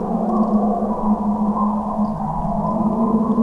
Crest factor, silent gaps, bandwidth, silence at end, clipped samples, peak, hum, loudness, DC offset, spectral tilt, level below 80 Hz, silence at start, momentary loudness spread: 12 dB; none; 2.3 kHz; 0 s; under 0.1%; -6 dBFS; none; -20 LUFS; under 0.1%; -11 dB/octave; -36 dBFS; 0 s; 4 LU